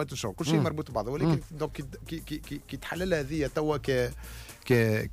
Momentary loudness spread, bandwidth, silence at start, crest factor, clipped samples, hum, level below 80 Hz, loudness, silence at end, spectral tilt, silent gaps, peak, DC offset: 14 LU; 15.5 kHz; 0 s; 16 dB; under 0.1%; none; -46 dBFS; -30 LUFS; 0 s; -6 dB/octave; none; -14 dBFS; under 0.1%